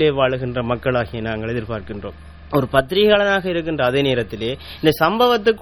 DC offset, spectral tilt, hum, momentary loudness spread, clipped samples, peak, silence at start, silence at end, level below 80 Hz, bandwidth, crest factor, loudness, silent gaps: 0.3%; -6 dB/octave; none; 11 LU; under 0.1%; 0 dBFS; 0 s; 0 s; -42 dBFS; 18 kHz; 18 dB; -19 LUFS; none